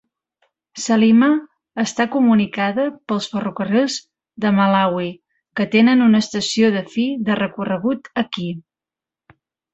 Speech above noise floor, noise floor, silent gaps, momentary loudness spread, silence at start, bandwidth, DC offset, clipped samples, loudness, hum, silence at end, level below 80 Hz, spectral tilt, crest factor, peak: 72 dB; -89 dBFS; none; 13 LU; 0.75 s; 8.2 kHz; under 0.1%; under 0.1%; -18 LUFS; none; 1.15 s; -62 dBFS; -5 dB/octave; 16 dB; -2 dBFS